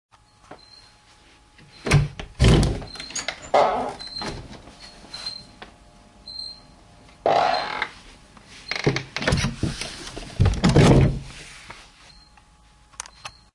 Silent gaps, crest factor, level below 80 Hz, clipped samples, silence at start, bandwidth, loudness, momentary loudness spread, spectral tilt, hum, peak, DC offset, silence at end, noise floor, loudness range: none; 22 dB; -34 dBFS; under 0.1%; 0.5 s; 11.5 kHz; -23 LUFS; 25 LU; -5.5 dB/octave; none; -2 dBFS; under 0.1%; 0.25 s; -54 dBFS; 6 LU